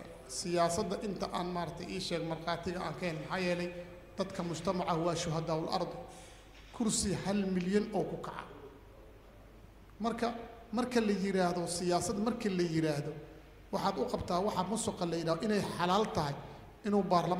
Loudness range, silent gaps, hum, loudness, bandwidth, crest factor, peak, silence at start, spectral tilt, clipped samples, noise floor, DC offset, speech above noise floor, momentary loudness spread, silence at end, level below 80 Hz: 4 LU; none; none; -34 LUFS; 16 kHz; 20 dB; -16 dBFS; 0 s; -5 dB/octave; under 0.1%; -55 dBFS; under 0.1%; 21 dB; 14 LU; 0 s; -58 dBFS